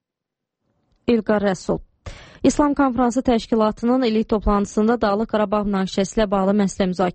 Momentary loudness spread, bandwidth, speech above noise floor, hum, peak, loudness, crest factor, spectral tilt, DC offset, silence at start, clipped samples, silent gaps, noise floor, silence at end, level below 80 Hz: 4 LU; 8.8 kHz; 65 dB; none; -4 dBFS; -20 LUFS; 16 dB; -6 dB/octave; under 0.1%; 1.1 s; under 0.1%; none; -84 dBFS; 0 s; -38 dBFS